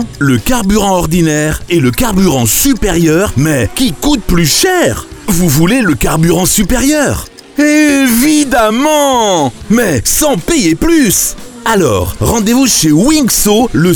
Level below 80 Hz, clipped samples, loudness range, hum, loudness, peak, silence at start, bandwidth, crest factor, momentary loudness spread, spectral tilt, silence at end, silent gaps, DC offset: -24 dBFS; under 0.1%; 1 LU; none; -10 LUFS; 0 dBFS; 0 s; over 20 kHz; 10 dB; 5 LU; -4 dB/octave; 0 s; none; 0.3%